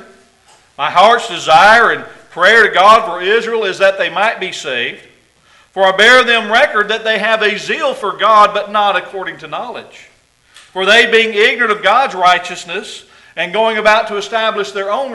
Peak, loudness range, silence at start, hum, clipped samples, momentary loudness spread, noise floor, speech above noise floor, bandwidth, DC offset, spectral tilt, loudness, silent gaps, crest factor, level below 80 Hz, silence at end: 0 dBFS; 4 LU; 0.8 s; none; 0.2%; 16 LU; -49 dBFS; 37 dB; 12 kHz; under 0.1%; -2 dB/octave; -11 LUFS; none; 12 dB; -52 dBFS; 0 s